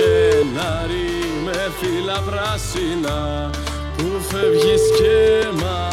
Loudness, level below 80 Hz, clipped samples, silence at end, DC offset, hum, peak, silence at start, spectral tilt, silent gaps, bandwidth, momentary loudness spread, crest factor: -19 LUFS; -32 dBFS; under 0.1%; 0 s; under 0.1%; none; -6 dBFS; 0 s; -5 dB/octave; none; 15.5 kHz; 9 LU; 12 dB